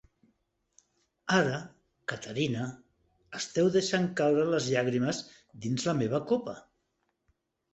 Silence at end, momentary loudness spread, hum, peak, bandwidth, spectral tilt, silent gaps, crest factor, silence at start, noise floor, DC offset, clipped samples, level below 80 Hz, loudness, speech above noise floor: 1.15 s; 15 LU; none; -10 dBFS; 8.2 kHz; -5 dB/octave; none; 22 dB; 1.25 s; -78 dBFS; under 0.1%; under 0.1%; -68 dBFS; -30 LUFS; 50 dB